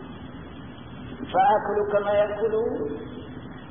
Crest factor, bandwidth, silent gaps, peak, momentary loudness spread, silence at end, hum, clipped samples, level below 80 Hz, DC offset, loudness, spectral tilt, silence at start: 16 dB; 3.7 kHz; none; -10 dBFS; 20 LU; 0 s; none; under 0.1%; -52 dBFS; 0.3%; -24 LUFS; -10 dB/octave; 0 s